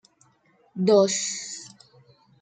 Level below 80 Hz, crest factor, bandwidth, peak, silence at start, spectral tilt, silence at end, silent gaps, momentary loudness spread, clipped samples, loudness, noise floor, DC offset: -76 dBFS; 20 dB; 9.6 kHz; -6 dBFS; 0.75 s; -4 dB/octave; 0.75 s; none; 22 LU; under 0.1%; -22 LUFS; -63 dBFS; under 0.1%